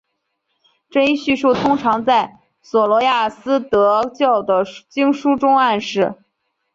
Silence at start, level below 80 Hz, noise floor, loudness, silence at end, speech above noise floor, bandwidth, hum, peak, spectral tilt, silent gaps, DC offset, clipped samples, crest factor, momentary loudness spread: 0.95 s; -56 dBFS; -72 dBFS; -17 LUFS; 0.6 s; 56 dB; 7.6 kHz; none; -4 dBFS; -5 dB/octave; none; under 0.1%; under 0.1%; 14 dB; 6 LU